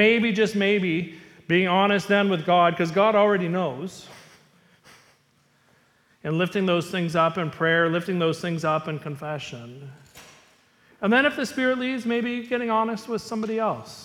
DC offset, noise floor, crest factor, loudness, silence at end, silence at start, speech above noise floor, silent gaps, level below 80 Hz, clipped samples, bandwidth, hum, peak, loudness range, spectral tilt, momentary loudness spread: under 0.1%; -63 dBFS; 18 dB; -23 LUFS; 0 s; 0 s; 40 dB; none; -66 dBFS; under 0.1%; 15.5 kHz; none; -6 dBFS; 8 LU; -6 dB/octave; 14 LU